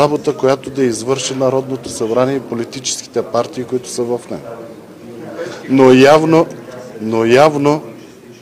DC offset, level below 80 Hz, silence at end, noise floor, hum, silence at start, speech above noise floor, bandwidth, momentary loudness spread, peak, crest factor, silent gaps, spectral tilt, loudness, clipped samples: under 0.1%; -54 dBFS; 0.1 s; -36 dBFS; none; 0 s; 23 dB; 15.5 kHz; 22 LU; 0 dBFS; 14 dB; none; -5 dB/octave; -14 LUFS; under 0.1%